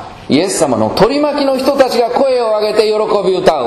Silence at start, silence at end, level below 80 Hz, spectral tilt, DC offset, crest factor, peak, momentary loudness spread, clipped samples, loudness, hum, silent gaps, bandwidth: 0 s; 0 s; -42 dBFS; -4.5 dB/octave; under 0.1%; 12 dB; 0 dBFS; 2 LU; 0.4%; -12 LUFS; none; none; 13.5 kHz